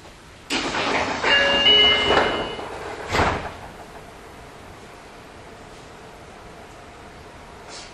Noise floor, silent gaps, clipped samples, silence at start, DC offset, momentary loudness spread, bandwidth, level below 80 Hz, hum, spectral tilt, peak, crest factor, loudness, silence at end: -44 dBFS; none; under 0.1%; 0 s; under 0.1%; 27 LU; 13.5 kHz; -44 dBFS; none; -2.5 dB/octave; -4 dBFS; 20 dB; -18 LUFS; 0 s